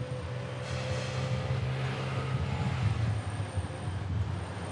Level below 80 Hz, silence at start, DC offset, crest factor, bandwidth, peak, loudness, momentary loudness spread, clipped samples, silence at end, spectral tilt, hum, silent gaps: -50 dBFS; 0 s; under 0.1%; 14 dB; 11 kHz; -18 dBFS; -34 LUFS; 6 LU; under 0.1%; 0 s; -6.5 dB/octave; none; none